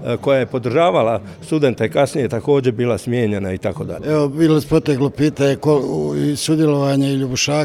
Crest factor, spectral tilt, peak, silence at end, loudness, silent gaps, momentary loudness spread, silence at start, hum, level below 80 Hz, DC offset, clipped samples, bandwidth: 14 dB; -6 dB/octave; -2 dBFS; 0 s; -17 LUFS; none; 5 LU; 0 s; none; -48 dBFS; under 0.1%; under 0.1%; 15 kHz